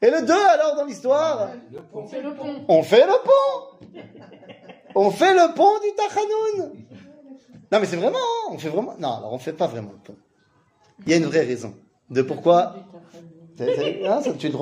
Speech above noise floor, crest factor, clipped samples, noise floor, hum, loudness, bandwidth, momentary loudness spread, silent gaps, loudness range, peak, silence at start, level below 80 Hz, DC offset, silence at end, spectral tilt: 42 dB; 18 dB; under 0.1%; -62 dBFS; none; -20 LUFS; 15.5 kHz; 16 LU; none; 6 LU; -4 dBFS; 0 s; -70 dBFS; under 0.1%; 0 s; -5 dB/octave